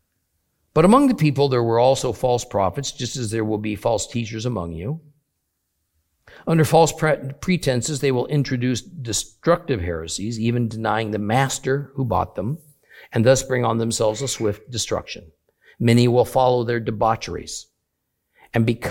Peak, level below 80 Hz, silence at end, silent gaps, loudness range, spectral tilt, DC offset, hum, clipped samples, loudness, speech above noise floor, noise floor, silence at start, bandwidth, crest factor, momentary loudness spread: -2 dBFS; -48 dBFS; 0 s; none; 5 LU; -5.5 dB/octave; under 0.1%; none; under 0.1%; -21 LUFS; 56 dB; -76 dBFS; 0.75 s; 17 kHz; 20 dB; 11 LU